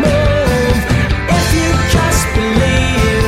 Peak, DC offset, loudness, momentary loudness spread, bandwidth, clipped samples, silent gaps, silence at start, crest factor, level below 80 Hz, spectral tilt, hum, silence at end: -2 dBFS; under 0.1%; -13 LUFS; 2 LU; 16.5 kHz; under 0.1%; none; 0 s; 10 dB; -20 dBFS; -5 dB/octave; none; 0 s